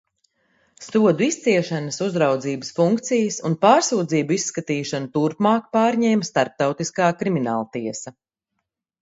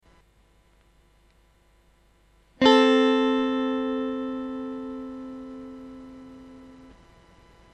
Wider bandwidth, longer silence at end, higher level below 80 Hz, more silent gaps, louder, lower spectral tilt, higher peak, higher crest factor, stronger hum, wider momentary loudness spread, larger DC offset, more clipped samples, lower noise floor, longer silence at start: about the same, 8 kHz vs 8.4 kHz; about the same, 0.9 s vs 0.9 s; second, -66 dBFS vs -60 dBFS; neither; about the same, -21 LUFS vs -23 LUFS; about the same, -5 dB/octave vs -4 dB/octave; about the same, -2 dBFS vs -4 dBFS; about the same, 20 dB vs 24 dB; neither; second, 8 LU vs 27 LU; neither; neither; first, -79 dBFS vs -60 dBFS; second, 0.8 s vs 2.6 s